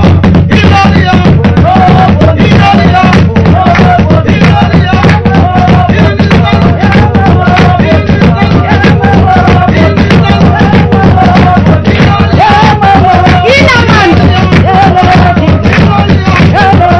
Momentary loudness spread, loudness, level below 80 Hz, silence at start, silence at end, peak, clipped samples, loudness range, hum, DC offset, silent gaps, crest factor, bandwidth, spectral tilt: 2 LU; -4 LUFS; -20 dBFS; 0 s; 0 s; 0 dBFS; 20%; 1 LU; none; 0.6%; none; 4 dB; 7.4 kHz; -7.5 dB/octave